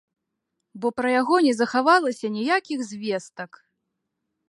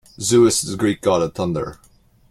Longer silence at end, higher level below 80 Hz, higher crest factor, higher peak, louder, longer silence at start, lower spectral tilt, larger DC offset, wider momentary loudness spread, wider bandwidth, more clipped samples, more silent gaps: first, 1.05 s vs 0.55 s; second, -74 dBFS vs -50 dBFS; about the same, 20 dB vs 16 dB; about the same, -6 dBFS vs -4 dBFS; second, -22 LUFS vs -18 LUFS; first, 0.75 s vs 0.2 s; about the same, -4 dB/octave vs -4.5 dB/octave; neither; about the same, 13 LU vs 11 LU; second, 11.5 kHz vs 15.5 kHz; neither; neither